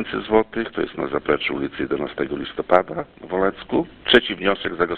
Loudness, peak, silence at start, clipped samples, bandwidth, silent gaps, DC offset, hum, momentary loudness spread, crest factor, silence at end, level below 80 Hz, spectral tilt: -22 LUFS; 0 dBFS; 0 s; under 0.1%; 6.2 kHz; none; under 0.1%; none; 10 LU; 22 dB; 0 s; -48 dBFS; -6.5 dB/octave